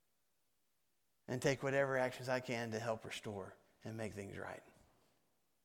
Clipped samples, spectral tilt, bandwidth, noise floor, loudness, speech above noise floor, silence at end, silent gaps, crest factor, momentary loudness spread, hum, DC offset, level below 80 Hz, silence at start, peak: under 0.1%; -5 dB/octave; 17.5 kHz; -85 dBFS; -41 LUFS; 44 dB; 0.95 s; none; 22 dB; 15 LU; none; under 0.1%; -76 dBFS; 1.3 s; -20 dBFS